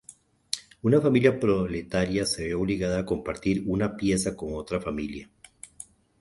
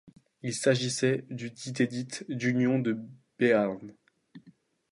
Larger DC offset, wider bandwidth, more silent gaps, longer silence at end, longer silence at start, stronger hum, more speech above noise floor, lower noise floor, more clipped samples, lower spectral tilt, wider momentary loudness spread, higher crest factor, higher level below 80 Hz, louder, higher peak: neither; about the same, 12 kHz vs 11.5 kHz; neither; about the same, 0.4 s vs 0.4 s; first, 0.55 s vs 0.05 s; neither; second, 28 dB vs 32 dB; second, -54 dBFS vs -61 dBFS; neither; about the same, -5.5 dB/octave vs -5 dB/octave; first, 21 LU vs 14 LU; about the same, 22 dB vs 20 dB; first, -48 dBFS vs -74 dBFS; first, -26 LUFS vs -29 LUFS; first, -4 dBFS vs -10 dBFS